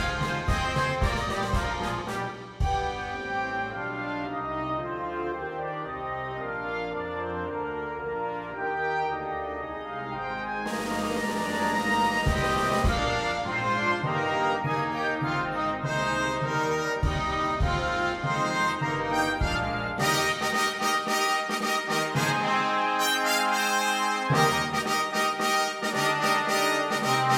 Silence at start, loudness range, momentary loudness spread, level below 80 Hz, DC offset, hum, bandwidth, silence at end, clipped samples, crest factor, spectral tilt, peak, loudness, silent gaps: 0 s; 7 LU; 8 LU; -40 dBFS; under 0.1%; none; 17.5 kHz; 0 s; under 0.1%; 16 dB; -4 dB/octave; -10 dBFS; -27 LUFS; none